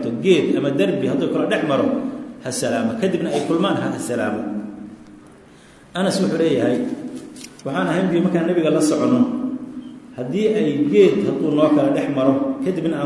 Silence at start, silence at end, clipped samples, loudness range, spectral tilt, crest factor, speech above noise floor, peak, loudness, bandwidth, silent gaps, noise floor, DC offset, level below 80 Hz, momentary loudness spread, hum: 0 s; 0 s; under 0.1%; 5 LU; -6 dB/octave; 18 dB; 28 dB; -2 dBFS; -19 LUFS; 12 kHz; none; -46 dBFS; under 0.1%; -60 dBFS; 15 LU; none